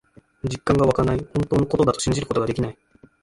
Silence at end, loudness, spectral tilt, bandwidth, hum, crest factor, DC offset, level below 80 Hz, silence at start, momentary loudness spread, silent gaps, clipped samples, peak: 0.5 s; -22 LUFS; -6 dB/octave; 11.5 kHz; none; 18 dB; under 0.1%; -40 dBFS; 0.45 s; 10 LU; none; under 0.1%; -4 dBFS